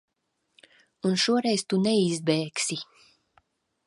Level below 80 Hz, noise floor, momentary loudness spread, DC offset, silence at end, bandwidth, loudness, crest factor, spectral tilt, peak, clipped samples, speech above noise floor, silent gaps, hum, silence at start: -74 dBFS; -77 dBFS; 8 LU; under 0.1%; 1.05 s; 11.5 kHz; -25 LUFS; 18 dB; -4.5 dB/octave; -10 dBFS; under 0.1%; 52 dB; none; none; 1.05 s